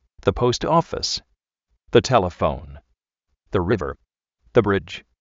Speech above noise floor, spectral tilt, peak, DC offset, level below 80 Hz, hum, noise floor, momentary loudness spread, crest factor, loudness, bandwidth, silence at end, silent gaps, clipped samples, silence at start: 56 dB; -4.5 dB/octave; -2 dBFS; under 0.1%; -42 dBFS; none; -76 dBFS; 12 LU; 22 dB; -21 LUFS; 7.8 kHz; 0.2 s; none; under 0.1%; 0.25 s